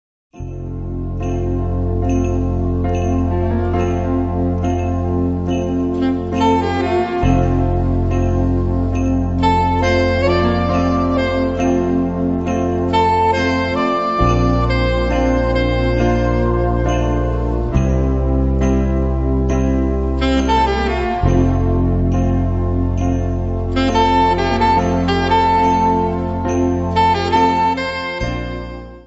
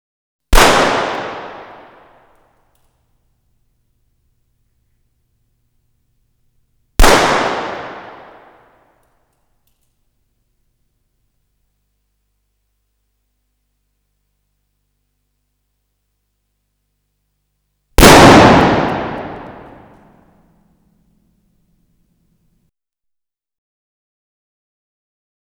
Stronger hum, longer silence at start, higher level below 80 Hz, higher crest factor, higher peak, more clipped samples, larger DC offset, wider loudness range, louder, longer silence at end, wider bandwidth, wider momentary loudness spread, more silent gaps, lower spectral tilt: second, none vs 50 Hz at -50 dBFS; second, 0.35 s vs 0.5 s; about the same, -24 dBFS vs -26 dBFS; about the same, 14 dB vs 18 dB; about the same, -2 dBFS vs 0 dBFS; second, under 0.1% vs 0.5%; neither; second, 3 LU vs 20 LU; second, -17 LUFS vs -10 LUFS; second, 0.05 s vs 6.05 s; second, 8 kHz vs over 20 kHz; second, 6 LU vs 29 LU; neither; first, -7.5 dB/octave vs -4 dB/octave